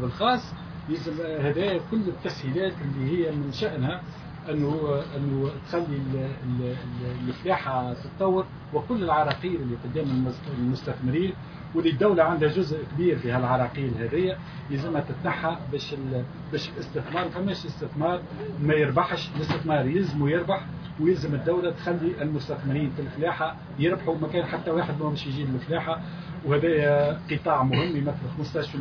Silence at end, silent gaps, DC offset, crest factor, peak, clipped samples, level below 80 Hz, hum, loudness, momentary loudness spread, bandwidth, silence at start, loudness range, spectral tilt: 0 s; none; under 0.1%; 20 dB; -8 dBFS; under 0.1%; -52 dBFS; none; -27 LUFS; 9 LU; 5.4 kHz; 0 s; 4 LU; -8 dB/octave